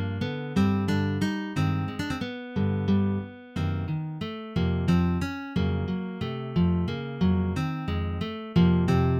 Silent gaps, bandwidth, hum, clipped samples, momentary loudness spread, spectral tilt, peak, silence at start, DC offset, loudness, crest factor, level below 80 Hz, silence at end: none; 10.5 kHz; none; under 0.1%; 8 LU; -8 dB/octave; -10 dBFS; 0 s; under 0.1%; -27 LUFS; 16 dB; -44 dBFS; 0 s